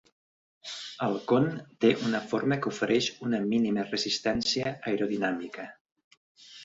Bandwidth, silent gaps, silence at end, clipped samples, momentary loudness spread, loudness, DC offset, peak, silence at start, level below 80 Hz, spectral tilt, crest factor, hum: 8 kHz; 5.81-5.85 s, 5.92-5.96 s, 6.04-6.11 s, 6.17-6.35 s; 0 s; under 0.1%; 13 LU; -28 LUFS; under 0.1%; -10 dBFS; 0.65 s; -64 dBFS; -5 dB/octave; 20 dB; none